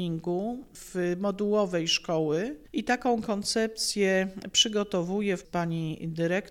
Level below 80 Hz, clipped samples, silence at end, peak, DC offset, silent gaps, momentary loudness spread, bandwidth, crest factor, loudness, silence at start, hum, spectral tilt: -58 dBFS; under 0.1%; 0 s; -8 dBFS; under 0.1%; none; 8 LU; 16.5 kHz; 20 dB; -28 LUFS; 0 s; none; -4 dB/octave